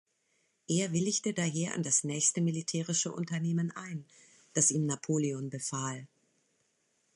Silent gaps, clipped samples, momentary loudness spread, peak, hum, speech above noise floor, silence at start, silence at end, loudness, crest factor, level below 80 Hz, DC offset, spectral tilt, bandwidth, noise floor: none; under 0.1%; 10 LU; -14 dBFS; none; 43 dB; 0.7 s; 1.1 s; -31 LUFS; 20 dB; -76 dBFS; under 0.1%; -4 dB/octave; 11.5 kHz; -75 dBFS